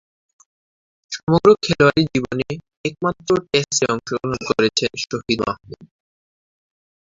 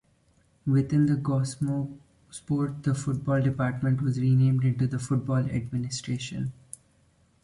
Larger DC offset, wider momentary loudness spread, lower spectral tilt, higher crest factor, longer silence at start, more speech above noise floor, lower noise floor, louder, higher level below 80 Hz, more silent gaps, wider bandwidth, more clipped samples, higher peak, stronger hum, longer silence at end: neither; about the same, 13 LU vs 13 LU; second, -4.5 dB/octave vs -7 dB/octave; first, 20 dB vs 14 dB; first, 1.1 s vs 0.65 s; first, over 71 dB vs 39 dB; first, under -90 dBFS vs -65 dBFS; first, -19 LUFS vs -27 LUFS; first, -50 dBFS vs -56 dBFS; first, 1.23-1.27 s, 2.77-2.84 s vs none; second, 7.8 kHz vs 11.5 kHz; neither; first, -2 dBFS vs -14 dBFS; neither; first, 1.25 s vs 0.9 s